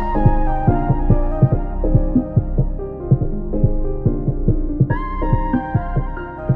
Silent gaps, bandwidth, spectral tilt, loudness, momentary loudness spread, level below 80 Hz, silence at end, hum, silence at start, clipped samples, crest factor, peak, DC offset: none; 3.3 kHz; -12.5 dB/octave; -20 LUFS; 6 LU; -20 dBFS; 0 s; none; 0 s; under 0.1%; 16 dB; 0 dBFS; under 0.1%